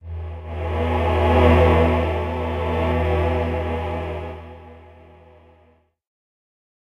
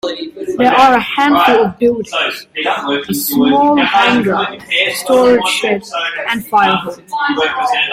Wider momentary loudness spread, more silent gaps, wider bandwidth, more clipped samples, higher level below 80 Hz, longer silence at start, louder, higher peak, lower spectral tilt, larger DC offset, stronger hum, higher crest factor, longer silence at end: first, 17 LU vs 9 LU; neither; second, 5.6 kHz vs 16.5 kHz; neither; first, -30 dBFS vs -50 dBFS; about the same, 0.05 s vs 0.05 s; second, -20 LUFS vs -13 LUFS; second, -4 dBFS vs 0 dBFS; first, -8.5 dB/octave vs -3.5 dB/octave; neither; neither; first, 18 dB vs 12 dB; first, 2.05 s vs 0 s